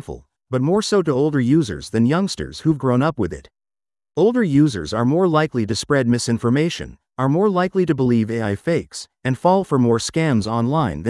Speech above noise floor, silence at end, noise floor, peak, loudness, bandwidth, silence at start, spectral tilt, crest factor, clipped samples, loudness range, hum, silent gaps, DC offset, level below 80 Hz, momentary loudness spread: over 72 dB; 0 s; under -90 dBFS; -2 dBFS; -19 LUFS; 12 kHz; 0.1 s; -6.5 dB/octave; 16 dB; under 0.1%; 2 LU; none; none; under 0.1%; -48 dBFS; 9 LU